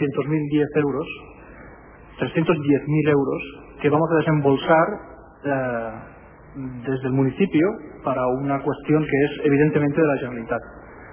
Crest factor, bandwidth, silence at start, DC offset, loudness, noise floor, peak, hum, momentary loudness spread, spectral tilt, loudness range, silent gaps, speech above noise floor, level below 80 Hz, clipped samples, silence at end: 16 dB; 3.5 kHz; 0 s; under 0.1%; -21 LUFS; -44 dBFS; -4 dBFS; none; 14 LU; -11.5 dB/octave; 4 LU; none; 23 dB; -50 dBFS; under 0.1%; 0 s